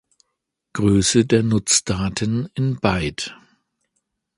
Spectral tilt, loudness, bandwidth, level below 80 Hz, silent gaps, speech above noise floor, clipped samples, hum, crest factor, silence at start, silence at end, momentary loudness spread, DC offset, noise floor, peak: -4.5 dB/octave; -19 LUFS; 11.5 kHz; -42 dBFS; none; 59 dB; under 0.1%; none; 20 dB; 0.75 s; 1.05 s; 11 LU; under 0.1%; -78 dBFS; 0 dBFS